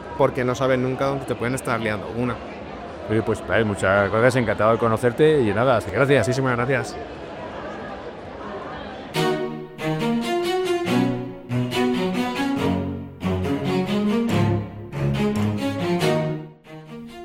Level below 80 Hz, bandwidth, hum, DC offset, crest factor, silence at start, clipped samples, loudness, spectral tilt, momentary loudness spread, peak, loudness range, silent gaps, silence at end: -48 dBFS; 16.5 kHz; none; under 0.1%; 18 dB; 0 s; under 0.1%; -22 LUFS; -6.5 dB/octave; 15 LU; -4 dBFS; 7 LU; none; 0 s